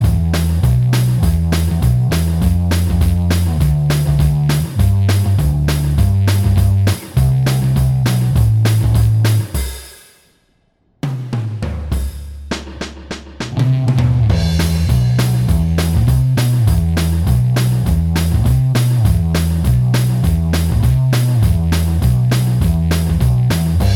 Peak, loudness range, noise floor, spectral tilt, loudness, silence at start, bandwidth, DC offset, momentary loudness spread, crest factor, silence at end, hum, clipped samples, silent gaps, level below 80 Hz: -2 dBFS; 6 LU; -59 dBFS; -6.5 dB/octave; -15 LUFS; 0 s; 17.5 kHz; under 0.1%; 8 LU; 12 dB; 0 s; none; under 0.1%; none; -22 dBFS